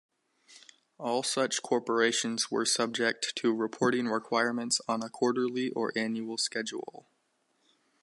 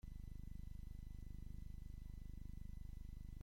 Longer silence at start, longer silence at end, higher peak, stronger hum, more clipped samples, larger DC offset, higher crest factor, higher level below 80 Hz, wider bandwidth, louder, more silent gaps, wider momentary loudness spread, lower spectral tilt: first, 0.5 s vs 0.05 s; first, 1.1 s vs 0 s; first, -12 dBFS vs -40 dBFS; second, none vs 50 Hz at -55 dBFS; neither; neither; first, 20 dB vs 12 dB; second, -82 dBFS vs -52 dBFS; second, 11.5 kHz vs 16.5 kHz; first, -30 LUFS vs -57 LUFS; neither; first, 6 LU vs 1 LU; second, -2.5 dB/octave vs -7.5 dB/octave